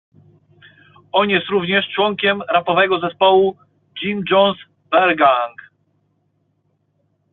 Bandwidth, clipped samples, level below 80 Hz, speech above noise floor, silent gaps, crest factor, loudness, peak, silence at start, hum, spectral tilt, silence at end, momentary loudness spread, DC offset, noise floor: 4.2 kHz; under 0.1%; -62 dBFS; 49 dB; none; 18 dB; -16 LUFS; 0 dBFS; 1.15 s; none; -2 dB/octave; 1.85 s; 10 LU; under 0.1%; -65 dBFS